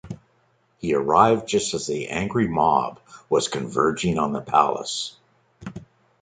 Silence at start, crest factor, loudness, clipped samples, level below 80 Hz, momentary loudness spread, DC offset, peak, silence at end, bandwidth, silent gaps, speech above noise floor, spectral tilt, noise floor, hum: 0.05 s; 22 dB; -22 LUFS; under 0.1%; -52 dBFS; 21 LU; under 0.1%; -2 dBFS; 0.4 s; 9.6 kHz; none; 42 dB; -4.5 dB/octave; -64 dBFS; none